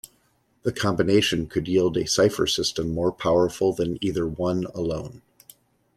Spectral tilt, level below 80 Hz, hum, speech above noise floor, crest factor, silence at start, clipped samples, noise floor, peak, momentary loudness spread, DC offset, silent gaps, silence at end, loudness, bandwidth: -4.5 dB/octave; -50 dBFS; none; 42 dB; 18 dB; 0.65 s; under 0.1%; -65 dBFS; -6 dBFS; 9 LU; under 0.1%; none; 0.8 s; -24 LUFS; 15 kHz